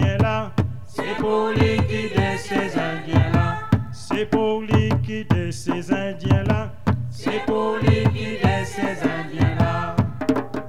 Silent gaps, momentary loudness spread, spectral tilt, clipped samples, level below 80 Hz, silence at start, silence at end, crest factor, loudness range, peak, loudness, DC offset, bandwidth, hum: none; 6 LU; -7 dB/octave; under 0.1%; -40 dBFS; 0 s; 0 s; 18 dB; 1 LU; -2 dBFS; -22 LUFS; 2%; 12 kHz; none